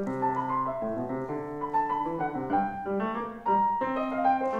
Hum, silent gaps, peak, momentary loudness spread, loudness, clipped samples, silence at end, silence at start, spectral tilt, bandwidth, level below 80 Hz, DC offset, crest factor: none; none; -14 dBFS; 7 LU; -29 LUFS; under 0.1%; 0 s; 0 s; -8 dB/octave; 8.4 kHz; -58 dBFS; under 0.1%; 14 dB